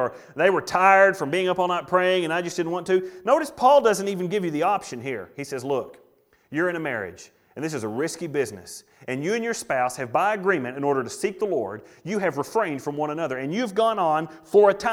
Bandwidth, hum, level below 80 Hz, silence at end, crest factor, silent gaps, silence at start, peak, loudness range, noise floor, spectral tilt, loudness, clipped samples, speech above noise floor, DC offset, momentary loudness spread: 16.5 kHz; none; -66 dBFS; 0 s; 20 dB; none; 0 s; -4 dBFS; 8 LU; -60 dBFS; -4.5 dB/octave; -23 LUFS; under 0.1%; 37 dB; under 0.1%; 14 LU